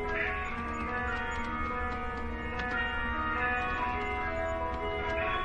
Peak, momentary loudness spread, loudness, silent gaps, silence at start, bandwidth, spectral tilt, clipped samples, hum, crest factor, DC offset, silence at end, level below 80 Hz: -18 dBFS; 5 LU; -33 LUFS; none; 0 s; 10.5 kHz; -6 dB/octave; under 0.1%; none; 14 dB; under 0.1%; 0 s; -42 dBFS